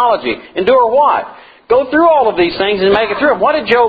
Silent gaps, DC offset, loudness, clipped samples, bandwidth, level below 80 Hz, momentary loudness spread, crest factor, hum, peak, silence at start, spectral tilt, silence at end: none; under 0.1%; -12 LUFS; under 0.1%; 5 kHz; -46 dBFS; 7 LU; 12 dB; none; 0 dBFS; 0 s; -7 dB/octave; 0 s